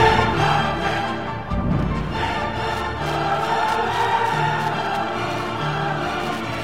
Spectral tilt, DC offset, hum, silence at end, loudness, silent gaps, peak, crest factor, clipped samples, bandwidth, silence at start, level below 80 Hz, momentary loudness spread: -5.5 dB/octave; 0.8%; none; 0 s; -22 LUFS; none; -4 dBFS; 18 dB; under 0.1%; 16 kHz; 0 s; -36 dBFS; 6 LU